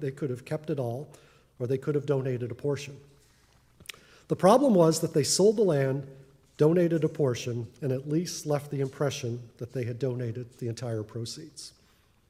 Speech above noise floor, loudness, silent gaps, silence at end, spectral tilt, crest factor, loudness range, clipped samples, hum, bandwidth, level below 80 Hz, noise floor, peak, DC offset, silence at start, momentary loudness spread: 36 dB; -28 LUFS; none; 0.6 s; -6 dB/octave; 22 dB; 9 LU; under 0.1%; none; 16 kHz; -68 dBFS; -63 dBFS; -6 dBFS; under 0.1%; 0 s; 18 LU